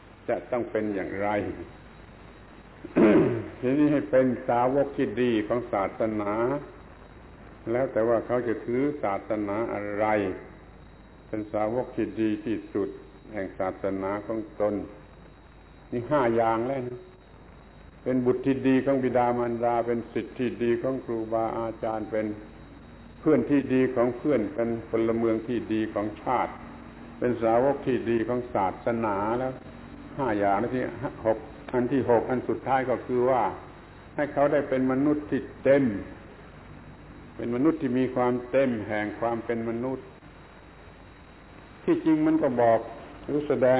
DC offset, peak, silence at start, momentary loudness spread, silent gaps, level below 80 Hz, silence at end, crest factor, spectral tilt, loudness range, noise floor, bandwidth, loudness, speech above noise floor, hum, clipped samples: under 0.1%; -8 dBFS; 0.05 s; 17 LU; none; -54 dBFS; 0 s; 18 dB; -11 dB/octave; 5 LU; -50 dBFS; 4 kHz; -27 LUFS; 24 dB; none; under 0.1%